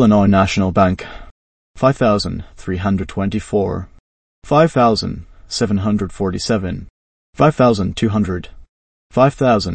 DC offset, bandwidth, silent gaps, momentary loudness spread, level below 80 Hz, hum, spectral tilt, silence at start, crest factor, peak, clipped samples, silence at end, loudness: under 0.1%; 8.8 kHz; 1.31-1.74 s, 4.00-4.42 s, 6.90-7.33 s, 8.69-9.10 s; 14 LU; -38 dBFS; none; -6.5 dB/octave; 0 s; 16 dB; 0 dBFS; under 0.1%; 0 s; -17 LUFS